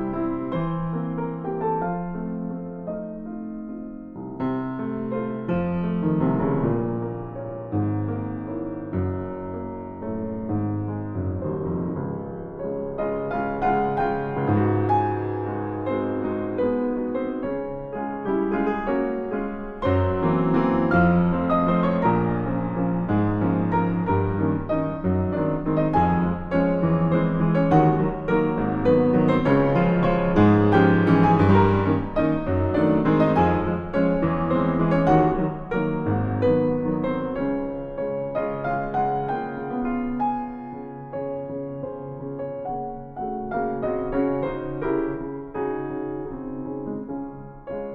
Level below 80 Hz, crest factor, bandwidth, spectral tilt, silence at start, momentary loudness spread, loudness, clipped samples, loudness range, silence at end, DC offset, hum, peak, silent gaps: -42 dBFS; 18 dB; 5.2 kHz; -10 dB/octave; 0 s; 13 LU; -24 LUFS; under 0.1%; 10 LU; 0 s; under 0.1%; none; -6 dBFS; none